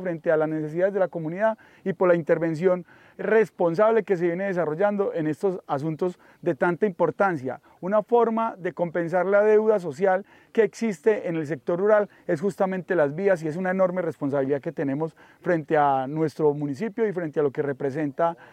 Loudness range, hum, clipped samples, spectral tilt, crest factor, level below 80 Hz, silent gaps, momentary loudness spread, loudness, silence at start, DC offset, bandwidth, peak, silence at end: 2 LU; none; under 0.1%; -8 dB/octave; 18 dB; -74 dBFS; none; 8 LU; -24 LUFS; 0 s; under 0.1%; 10 kHz; -6 dBFS; 0.1 s